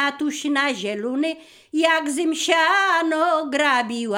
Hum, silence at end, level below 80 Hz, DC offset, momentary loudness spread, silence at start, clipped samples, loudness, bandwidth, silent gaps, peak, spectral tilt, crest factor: none; 0 s; -72 dBFS; under 0.1%; 9 LU; 0 s; under 0.1%; -20 LUFS; 16.5 kHz; none; -4 dBFS; -2 dB/octave; 16 dB